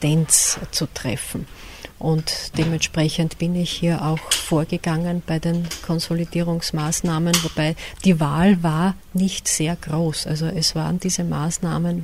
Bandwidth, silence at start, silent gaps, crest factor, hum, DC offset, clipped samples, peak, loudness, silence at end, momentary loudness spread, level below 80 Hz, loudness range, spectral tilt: 15.5 kHz; 0 s; none; 20 dB; none; under 0.1%; under 0.1%; -2 dBFS; -21 LUFS; 0 s; 8 LU; -42 dBFS; 3 LU; -4.5 dB/octave